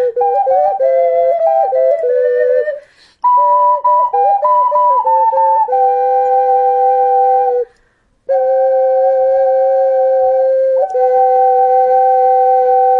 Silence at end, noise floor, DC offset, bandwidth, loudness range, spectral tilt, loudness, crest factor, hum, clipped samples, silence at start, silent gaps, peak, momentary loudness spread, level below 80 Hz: 0 s; -56 dBFS; under 0.1%; 4.5 kHz; 2 LU; -4.5 dB/octave; -12 LUFS; 8 dB; none; under 0.1%; 0 s; none; -2 dBFS; 3 LU; -62 dBFS